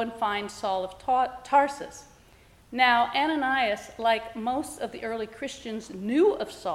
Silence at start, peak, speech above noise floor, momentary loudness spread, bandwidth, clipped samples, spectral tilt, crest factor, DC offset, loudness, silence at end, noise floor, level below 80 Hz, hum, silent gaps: 0 s; -8 dBFS; 29 dB; 12 LU; 15.5 kHz; under 0.1%; -3.5 dB/octave; 20 dB; under 0.1%; -27 LUFS; 0 s; -56 dBFS; -60 dBFS; none; none